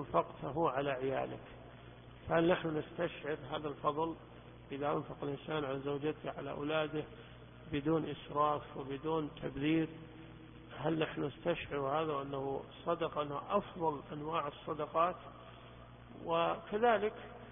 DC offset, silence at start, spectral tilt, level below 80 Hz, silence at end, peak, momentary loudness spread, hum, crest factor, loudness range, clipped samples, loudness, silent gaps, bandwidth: under 0.1%; 0 s; -3.5 dB/octave; -62 dBFS; 0 s; -18 dBFS; 19 LU; 60 Hz at -60 dBFS; 20 dB; 3 LU; under 0.1%; -37 LUFS; none; 3.7 kHz